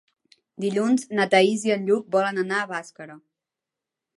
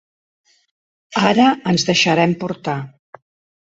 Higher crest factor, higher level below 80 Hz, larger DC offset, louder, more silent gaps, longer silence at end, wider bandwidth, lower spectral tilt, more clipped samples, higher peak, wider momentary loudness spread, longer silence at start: about the same, 20 dB vs 18 dB; second, -78 dBFS vs -58 dBFS; neither; second, -23 LUFS vs -17 LUFS; neither; first, 1 s vs 0.8 s; first, 11.5 kHz vs 8 kHz; about the same, -4.5 dB/octave vs -4.5 dB/octave; neither; second, -6 dBFS vs -2 dBFS; first, 17 LU vs 12 LU; second, 0.6 s vs 1.1 s